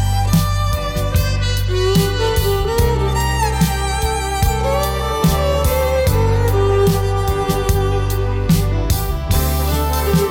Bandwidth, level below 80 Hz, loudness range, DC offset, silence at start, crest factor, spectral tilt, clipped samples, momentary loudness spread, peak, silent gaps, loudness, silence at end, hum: 18 kHz; -20 dBFS; 1 LU; under 0.1%; 0 s; 14 dB; -5.5 dB/octave; under 0.1%; 3 LU; -2 dBFS; none; -17 LUFS; 0 s; none